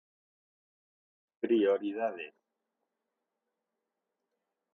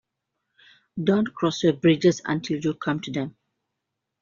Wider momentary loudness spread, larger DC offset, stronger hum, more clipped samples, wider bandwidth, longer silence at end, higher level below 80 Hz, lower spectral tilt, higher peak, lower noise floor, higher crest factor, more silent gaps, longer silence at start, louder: first, 17 LU vs 11 LU; neither; neither; neither; second, 3.9 kHz vs 7.4 kHz; first, 2.45 s vs 0.9 s; second, -88 dBFS vs -64 dBFS; first, -7.5 dB/octave vs -5.5 dB/octave; second, -18 dBFS vs -8 dBFS; first, -87 dBFS vs -82 dBFS; about the same, 20 dB vs 18 dB; neither; first, 1.45 s vs 0.95 s; second, -31 LUFS vs -24 LUFS